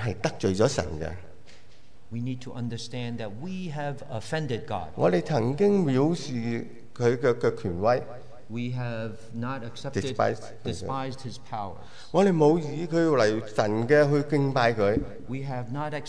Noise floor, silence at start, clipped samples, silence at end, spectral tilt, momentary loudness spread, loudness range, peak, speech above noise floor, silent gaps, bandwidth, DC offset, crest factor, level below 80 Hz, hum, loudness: -57 dBFS; 0 s; under 0.1%; 0 s; -6.5 dB/octave; 14 LU; 10 LU; -8 dBFS; 30 dB; none; 10.5 kHz; 1%; 18 dB; -54 dBFS; none; -27 LUFS